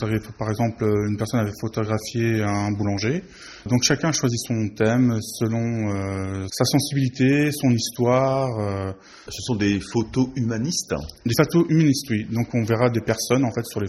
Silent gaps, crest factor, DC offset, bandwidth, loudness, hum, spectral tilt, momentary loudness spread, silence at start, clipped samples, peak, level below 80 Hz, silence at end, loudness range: none; 18 dB; under 0.1%; 13 kHz; -22 LUFS; none; -5.5 dB/octave; 8 LU; 0 s; under 0.1%; -4 dBFS; -50 dBFS; 0 s; 2 LU